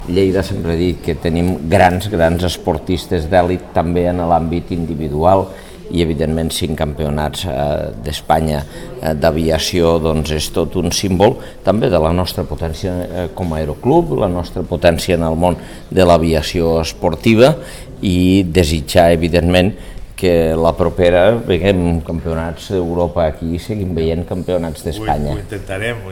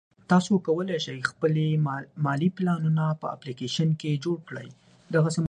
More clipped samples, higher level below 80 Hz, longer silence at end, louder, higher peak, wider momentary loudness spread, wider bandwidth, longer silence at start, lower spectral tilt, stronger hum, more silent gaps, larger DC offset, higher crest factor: neither; first, -30 dBFS vs -68 dBFS; about the same, 0 s vs 0.05 s; first, -16 LUFS vs -26 LUFS; first, 0 dBFS vs -8 dBFS; about the same, 10 LU vs 9 LU; first, 17.5 kHz vs 9.8 kHz; second, 0 s vs 0.3 s; about the same, -6 dB/octave vs -6.5 dB/octave; neither; neither; first, 0.4% vs under 0.1%; about the same, 14 dB vs 18 dB